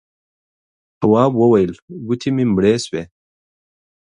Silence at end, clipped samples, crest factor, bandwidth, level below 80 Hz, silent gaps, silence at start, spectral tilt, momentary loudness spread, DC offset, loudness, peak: 1.1 s; under 0.1%; 18 dB; 11 kHz; -50 dBFS; 1.82-1.88 s; 1 s; -7 dB/octave; 12 LU; under 0.1%; -16 LUFS; 0 dBFS